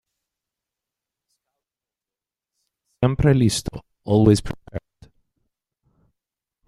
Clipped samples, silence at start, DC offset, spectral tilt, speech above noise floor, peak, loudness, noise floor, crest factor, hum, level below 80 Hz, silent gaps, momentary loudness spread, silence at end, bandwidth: under 0.1%; 3 s; under 0.1%; -6.5 dB/octave; 72 dB; -2 dBFS; -19 LUFS; -90 dBFS; 22 dB; none; -42 dBFS; none; 20 LU; 1.9 s; 13 kHz